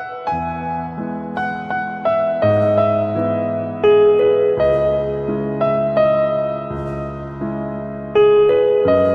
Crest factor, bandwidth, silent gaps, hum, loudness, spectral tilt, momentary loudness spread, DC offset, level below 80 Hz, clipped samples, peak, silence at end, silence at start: 12 dB; 5 kHz; none; none; -17 LUFS; -9 dB/octave; 12 LU; under 0.1%; -42 dBFS; under 0.1%; -4 dBFS; 0 s; 0 s